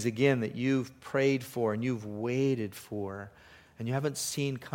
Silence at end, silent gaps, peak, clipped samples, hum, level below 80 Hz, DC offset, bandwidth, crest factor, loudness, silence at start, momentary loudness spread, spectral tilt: 0 s; none; -12 dBFS; under 0.1%; none; -68 dBFS; under 0.1%; 17 kHz; 20 dB; -31 LUFS; 0 s; 11 LU; -5.5 dB/octave